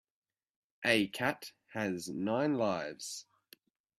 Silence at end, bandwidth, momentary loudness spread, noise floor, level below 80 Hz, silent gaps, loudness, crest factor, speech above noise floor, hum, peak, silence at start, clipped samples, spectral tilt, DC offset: 0.75 s; 14.5 kHz; 14 LU; -64 dBFS; -74 dBFS; none; -34 LUFS; 24 dB; 31 dB; none; -12 dBFS; 0.8 s; under 0.1%; -4 dB/octave; under 0.1%